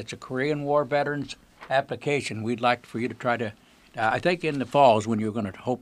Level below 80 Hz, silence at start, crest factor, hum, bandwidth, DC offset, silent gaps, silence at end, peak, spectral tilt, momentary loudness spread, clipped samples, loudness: -62 dBFS; 0 s; 20 dB; none; 13 kHz; under 0.1%; none; 0 s; -6 dBFS; -5.5 dB/octave; 13 LU; under 0.1%; -25 LUFS